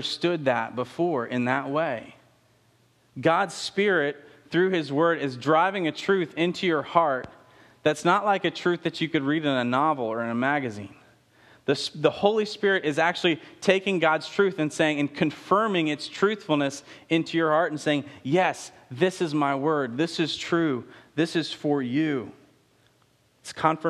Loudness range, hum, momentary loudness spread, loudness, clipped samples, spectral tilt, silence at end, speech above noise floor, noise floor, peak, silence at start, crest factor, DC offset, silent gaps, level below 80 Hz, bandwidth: 3 LU; none; 7 LU; -25 LUFS; under 0.1%; -5 dB/octave; 0 s; 39 dB; -64 dBFS; -4 dBFS; 0 s; 22 dB; under 0.1%; none; -70 dBFS; 12.5 kHz